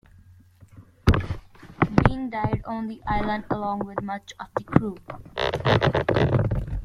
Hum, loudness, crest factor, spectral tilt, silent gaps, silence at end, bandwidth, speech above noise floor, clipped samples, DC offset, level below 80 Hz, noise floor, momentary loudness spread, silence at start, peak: none; -25 LUFS; 24 dB; -7.5 dB/octave; none; 0 s; 11 kHz; 25 dB; under 0.1%; under 0.1%; -36 dBFS; -52 dBFS; 13 LU; 0.75 s; 0 dBFS